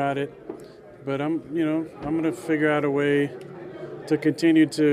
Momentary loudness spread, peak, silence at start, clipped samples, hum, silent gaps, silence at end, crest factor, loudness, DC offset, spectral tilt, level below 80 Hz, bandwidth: 19 LU; -8 dBFS; 0 s; under 0.1%; none; none; 0 s; 16 dB; -24 LUFS; under 0.1%; -6.5 dB/octave; -62 dBFS; 12 kHz